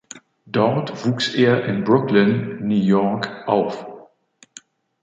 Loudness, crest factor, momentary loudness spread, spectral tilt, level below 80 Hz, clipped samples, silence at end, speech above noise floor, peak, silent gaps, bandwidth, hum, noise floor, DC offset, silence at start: -19 LUFS; 18 dB; 11 LU; -6.5 dB/octave; -60 dBFS; under 0.1%; 1 s; 36 dB; -2 dBFS; none; 7.8 kHz; none; -55 dBFS; under 0.1%; 0.15 s